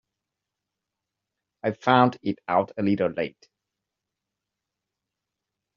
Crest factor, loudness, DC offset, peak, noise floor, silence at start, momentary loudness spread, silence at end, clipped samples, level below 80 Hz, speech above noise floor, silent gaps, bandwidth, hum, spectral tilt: 24 dB; -24 LUFS; under 0.1%; -4 dBFS; -86 dBFS; 1.65 s; 12 LU; 2.45 s; under 0.1%; -70 dBFS; 62 dB; none; 7.2 kHz; none; -5 dB/octave